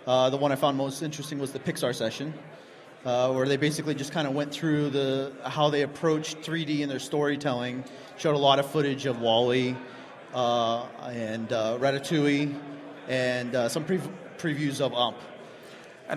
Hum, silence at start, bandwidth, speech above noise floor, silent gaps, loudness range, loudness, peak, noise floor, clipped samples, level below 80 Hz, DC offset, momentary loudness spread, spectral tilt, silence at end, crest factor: none; 0 s; 15.5 kHz; 20 dB; none; 3 LU; -27 LUFS; -6 dBFS; -47 dBFS; under 0.1%; -70 dBFS; under 0.1%; 15 LU; -5 dB/octave; 0 s; 20 dB